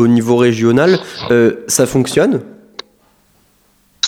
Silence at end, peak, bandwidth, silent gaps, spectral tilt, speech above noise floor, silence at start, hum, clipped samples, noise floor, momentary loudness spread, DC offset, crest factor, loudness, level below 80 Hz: 0 s; 0 dBFS; 17 kHz; none; -5 dB/octave; 43 dB; 0 s; none; under 0.1%; -55 dBFS; 21 LU; under 0.1%; 14 dB; -13 LUFS; -50 dBFS